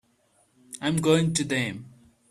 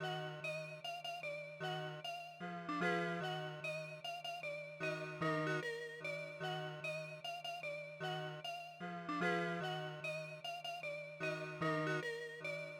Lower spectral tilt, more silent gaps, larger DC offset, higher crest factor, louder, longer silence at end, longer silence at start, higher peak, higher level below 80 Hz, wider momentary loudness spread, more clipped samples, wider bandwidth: about the same, -4.5 dB/octave vs -5 dB/octave; neither; neither; about the same, 20 dB vs 18 dB; first, -25 LUFS vs -43 LUFS; first, 0.4 s vs 0 s; first, 0.7 s vs 0 s; first, -8 dBFS vs -26 dBFS; first, -60 dBFS vs -84 dBFS; first, 17 LU vs 8 LU; neither; second, 14 kHz vs over 20 kHz